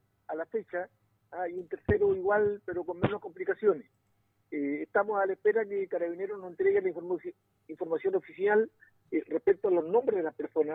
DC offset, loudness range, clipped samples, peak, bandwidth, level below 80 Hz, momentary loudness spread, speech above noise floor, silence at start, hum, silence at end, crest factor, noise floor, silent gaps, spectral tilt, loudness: under 0.1%; 2 LU; under 0.1%; -12 dBFS; 3.9 kHz; -58 dBFS; 11 LU; 43 dB; 0.3 s; none; 0 s; 18 dB; -73 dBFS; none; -10 dB/octave; -31 LUFS